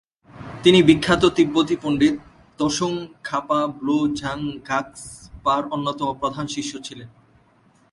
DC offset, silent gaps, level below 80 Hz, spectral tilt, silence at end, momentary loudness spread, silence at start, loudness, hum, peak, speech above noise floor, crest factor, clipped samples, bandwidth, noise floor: under 0.1%; none; -50 dBFS; -5 dB/octave; 0.85 s; 19 LU; 0.35 s; -21 LUFS; none; 0 dBFS; 37 dB; 22 dB; under 0.1%; 11.5 kHz; -57 dBFS